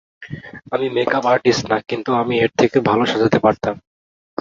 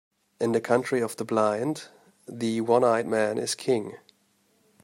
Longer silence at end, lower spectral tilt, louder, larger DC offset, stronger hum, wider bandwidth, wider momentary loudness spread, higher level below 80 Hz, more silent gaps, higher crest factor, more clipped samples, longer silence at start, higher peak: second, 0.65 s vs 0.85 s; about the same, -5.5 dB/octave vs -5 dB/octave; first, -17 LUFS vs -26 LUFS; neither; neither; second, 7.8 kHz vs 16 kHz; first, 18 LU vs 10 LU; first, -52 dBFS vs -74 dBFS; neither; about the same, 16 dB vs 20 dB; neither; second, 0.2 s vs 0.4 s; first, -2 dBFS vs -8 dBFS